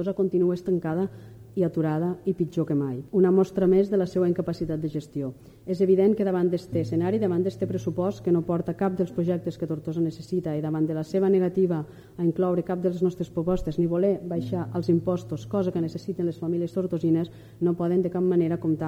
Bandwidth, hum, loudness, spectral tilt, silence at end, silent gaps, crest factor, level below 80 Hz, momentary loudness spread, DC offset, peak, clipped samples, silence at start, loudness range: 8.8 kHz; none; -26 LUFS; -9 dB/octave; 0 s; none; 16 dB; -54 dBFS; 8 LU; under 0.1%; -10 dBFS; under 0.1%; 0 s; 3 LU